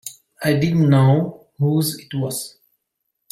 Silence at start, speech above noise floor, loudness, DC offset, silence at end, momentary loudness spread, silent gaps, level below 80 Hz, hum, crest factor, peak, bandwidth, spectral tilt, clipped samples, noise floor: 0.05 s; 59 dB; -19 LUFS; under 0.1%; 0.85 s; 14 LU; none; -56 dBFS; none; 16 dB; -4 dBFS; 16 kHz; -6.5 dB/octave; under 0.1%; -76 dBFS